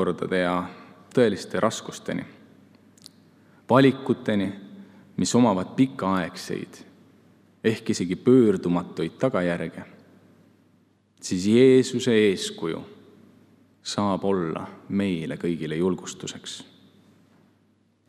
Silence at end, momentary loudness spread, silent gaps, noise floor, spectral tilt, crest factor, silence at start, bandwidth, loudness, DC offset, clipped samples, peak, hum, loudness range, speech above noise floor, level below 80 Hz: 1.45 s; 17 LU; none; -64 dBFS; -5.5 dB/octave; 22 dB; 0 s; 13.5 kHz; -24 LUFS; under 0.1%; under 0.1%; -2 dBFS; none; 6 LU; 41 dB; -70 dBFS